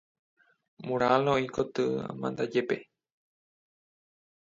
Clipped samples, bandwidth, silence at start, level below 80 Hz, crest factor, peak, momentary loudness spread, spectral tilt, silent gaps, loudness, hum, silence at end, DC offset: under 0.1%; 7.8 kHz; 0.8 s; -66 dBFS; 24 dB; -8 dBFS; 10 LU; -6.5 dB/octave; none; -29 LUFS; none; 1.7 s; under 0.1%